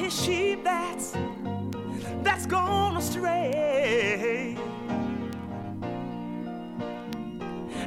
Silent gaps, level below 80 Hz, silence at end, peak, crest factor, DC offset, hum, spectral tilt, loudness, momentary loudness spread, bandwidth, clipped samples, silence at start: none; -54 dBFS; 0 s; -10 dBFS; 20 dB; under 0.1%; none; -4.5 dB/octave; -29 LUFS; 11 LU; 17 kHz; under 0.1%; 0 s